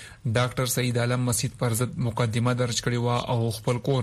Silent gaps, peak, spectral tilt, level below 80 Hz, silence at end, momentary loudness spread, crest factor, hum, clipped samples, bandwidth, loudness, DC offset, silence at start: none; -10 dBFS; -5 dB/octave; -52 dBFS; 0 s; 2 LU; 16 dB; none; under 0.1%; 14 kHz; -26 LUFS; under 0.1%; 0 s